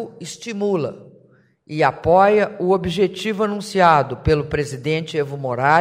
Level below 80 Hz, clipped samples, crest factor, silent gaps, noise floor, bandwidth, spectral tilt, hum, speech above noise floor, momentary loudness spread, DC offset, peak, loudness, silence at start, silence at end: -42 dBFS; under 0.1%; 18 dB; none; -54 dBFS; 15.5 kHz; -6 dB/octave; none; 36 dB; 10 LU; under 0.1%; -2 dBFS; -19 LUFS; 0 s; 0 s